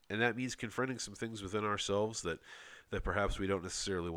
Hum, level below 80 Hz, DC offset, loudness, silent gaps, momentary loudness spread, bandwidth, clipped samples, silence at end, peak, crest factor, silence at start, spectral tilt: none; -50 dBFS; under 0.1%; -37 LUFS; none; 9 LU; 17 kHz; under 0.1%; 0 s; -18 dBFS; 20 dB; 0.1 s; -4 dB/octave